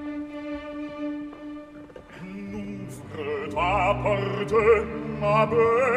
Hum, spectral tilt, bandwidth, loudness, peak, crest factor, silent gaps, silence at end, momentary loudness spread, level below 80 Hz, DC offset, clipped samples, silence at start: none; -7 dB/octave; 11 kHz; -25 LUFS; -8 dBFS; 18 dB; none; 0 s; 19 LU; -46 dBFS; under 0.1%; under 0.1%; 0 s